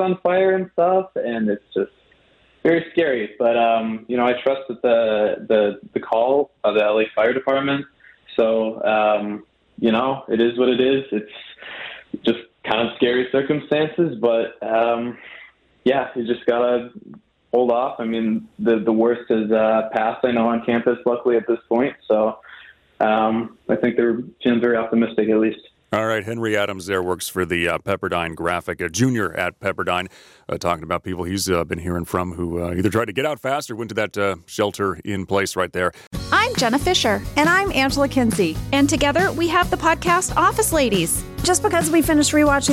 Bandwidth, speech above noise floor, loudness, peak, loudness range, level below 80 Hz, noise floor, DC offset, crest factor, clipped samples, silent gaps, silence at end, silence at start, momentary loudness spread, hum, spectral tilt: 16.5 kHz; 37 dB; -20 LUFS; -4 dBFS; 5 LU; -44 dBFS; -56 dBFS; under 0.1%; 16 dB; under 0.1%; 36.07-36.11 s; 0 s; 0 s; 8 LU; none; -4.5 dB/octave